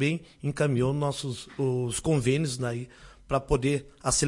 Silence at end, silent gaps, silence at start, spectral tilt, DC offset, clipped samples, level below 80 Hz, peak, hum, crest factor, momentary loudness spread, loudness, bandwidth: 0 s; none; 0 s; -5 dB/octave; under 0.1%; under 0.1%; -46 dBFS; -10 dBFS; none; 18 dB; 9 LU; -28 LUFS; 11.5 kHz